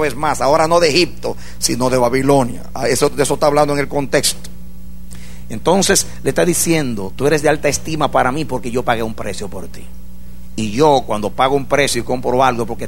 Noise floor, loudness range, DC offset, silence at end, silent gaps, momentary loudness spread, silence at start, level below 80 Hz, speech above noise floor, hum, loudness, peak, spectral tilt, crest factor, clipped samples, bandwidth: -36 dBFS; 4 LU; 6%; 0 s; none; 14 LU; 0 s; -36 dBFS; 20 dB; none; -16 LUFS; 0 dBFS; -4 dB/octave; 16 dB; under 0.1%; 16.5 kHz